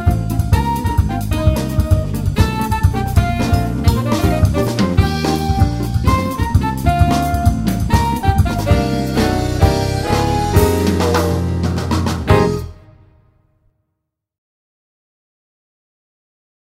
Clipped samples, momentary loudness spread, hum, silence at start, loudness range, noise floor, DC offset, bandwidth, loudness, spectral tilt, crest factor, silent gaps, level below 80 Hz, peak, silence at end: under 0.1%; 4 LU; none; 0 s; 4 LU; -75 dBFS; under 0.1%; 16.5 kHz; -16 LUFS; -6.5 dB/octave; 16 dB; none; -24 dBFS; 0 dBFS; 3.85 s